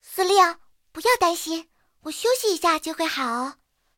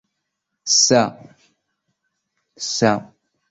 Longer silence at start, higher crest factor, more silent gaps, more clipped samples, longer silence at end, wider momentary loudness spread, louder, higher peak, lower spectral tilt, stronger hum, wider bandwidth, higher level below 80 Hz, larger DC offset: second, 0.1 s vs 0.65 s; about the same, 18 dB vs 20 dB; neither; neither; about the same, 0.45 s vs 0.45 s; about the same, 16 LU vs 15 LU; second, -22 LUFS vs -17 LUFS; second, -6 dBFS vs -2 dBFS; second, -1 dB/octave vs -2.5 dB/octave; neither; first, 17 kHz vs 8 kHz; about the same, -62 dBFS vs -62 dBFS; neither